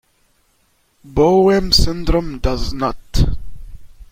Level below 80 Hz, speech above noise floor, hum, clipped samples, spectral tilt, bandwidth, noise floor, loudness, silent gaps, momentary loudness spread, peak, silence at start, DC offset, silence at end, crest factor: -24 dBFS; 45 dB; none; under 0.1%; -5.5 dB/octave; 16.5 kHz; -60 dBFS; -17 LUFS; none; 10 LU; 0 dBFS; 1.05 s; under 0.1%; 0.1 s; 18 dB